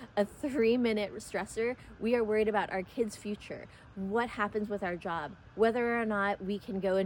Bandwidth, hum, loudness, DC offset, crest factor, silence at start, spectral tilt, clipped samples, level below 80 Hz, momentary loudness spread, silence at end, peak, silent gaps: 17.5 kHz; none; -32 LUFS; under 0.1%; 18 dB; 0 s; -5.5 dB/octave; under 0.1%; -60 dBFS; 12 LU; 0 s; -14 dBFS; none